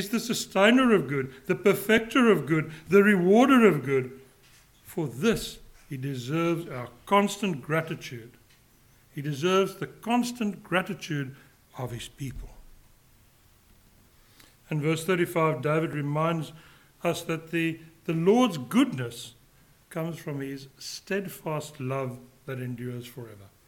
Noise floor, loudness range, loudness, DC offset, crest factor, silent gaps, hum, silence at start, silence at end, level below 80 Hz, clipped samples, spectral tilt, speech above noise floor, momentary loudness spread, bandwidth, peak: -59 dBFS; 12 LU; -26 LUFS; under 0.1%; 20 dB; none; none; 0 s; 0.2 s; -58 dBFS; under 0.1%; -5.5 dB/octave; 33 dB; 18 LU; 18 kHz; -6 dBFS